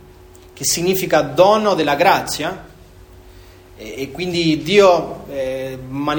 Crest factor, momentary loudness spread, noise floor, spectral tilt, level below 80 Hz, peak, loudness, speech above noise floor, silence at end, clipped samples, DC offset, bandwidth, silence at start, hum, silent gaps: 18 dB; 15 LU; -43 dBFS; -4 dB/octave; -46 dBFS; 0 dBFS; -16 LUFS; 26 dB; 0 s; under 0.1%; under 0.1%; over 20 kHz; 0.55 s; none; none